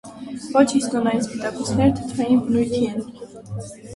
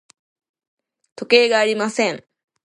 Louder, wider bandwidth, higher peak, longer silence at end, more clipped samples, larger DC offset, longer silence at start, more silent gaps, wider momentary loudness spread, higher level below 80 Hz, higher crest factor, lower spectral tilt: second, -21 LUFS vs -17 LUFS; about the same, 11.5 kHz vs 11 kHz; about the same, -2 dBFS vs 0 dBFS; second, 0 s vs 0.5 s; neither; neither; second, 0.05 s vs 1.2 s; neither; about the same, 16 LU vs 18 LU; first, -48 dBFS vs -74 dBFS; about the same, 18 dB vs 20 dB; first, -6 dB/octave vs -3 dB/octave